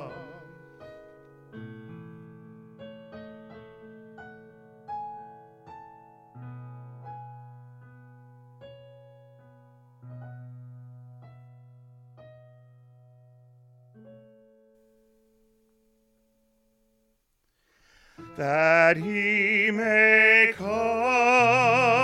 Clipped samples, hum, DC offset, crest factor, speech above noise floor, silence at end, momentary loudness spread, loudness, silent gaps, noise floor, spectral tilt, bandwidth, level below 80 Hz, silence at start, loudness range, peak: under 0.1%; none; under 0.1%; 24 dB; 51 dB; 0 s; 29 LU; -20 LUFS; none; -73 dBFS; -5 dB/octave; 12 kHz; -68 dBFS; 0 s; 28 LU; -6 dBFS